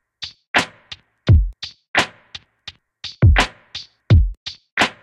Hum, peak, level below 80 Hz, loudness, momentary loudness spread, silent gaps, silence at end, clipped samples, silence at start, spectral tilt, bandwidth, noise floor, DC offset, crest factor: none; -2 dBFS; -24 dBFS; -18 LUFS; 22 LU; 0.47-0.54 s, 1.88-1.94 s, 4.37-4.46 s, 4.72-4.77 s; 0.15 s; under 0.1%; 0.2 s; -5 dB/octave; 12 kHz; -42 dBFS; under 0.1%; 18 dB